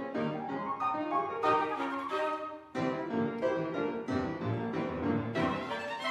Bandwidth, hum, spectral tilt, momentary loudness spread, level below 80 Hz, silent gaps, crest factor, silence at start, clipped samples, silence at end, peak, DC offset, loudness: 12 kHz; none; -7 dB/octave; 5 LU; -62 dBFS; none; 16 dB; 0 s; under 0.1%; 0 s; -16 dBFS; under 0.1%; -33 LUFS